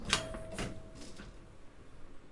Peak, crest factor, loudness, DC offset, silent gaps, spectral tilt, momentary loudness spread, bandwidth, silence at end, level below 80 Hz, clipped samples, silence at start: -10 dBFS; 30 dB; -40 LUFS; under 0.1%; none; -2.5 dB/octave; 24 LU; 11.5 kHz; 0 s; -52 dBFS; under 0.1%; 0 s